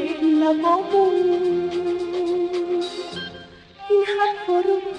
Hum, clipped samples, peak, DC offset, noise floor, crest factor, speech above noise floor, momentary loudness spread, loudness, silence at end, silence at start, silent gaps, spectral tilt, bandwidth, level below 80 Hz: none; under 0.1%; -8 dBFS; under 0.1%; -42 dBFS; 14 dB; 23 dB; 13 LU; -21 LUFS; 0 s; 0 s; none; -5.5 dB/octave; 9.6 kHz; -62 dBFS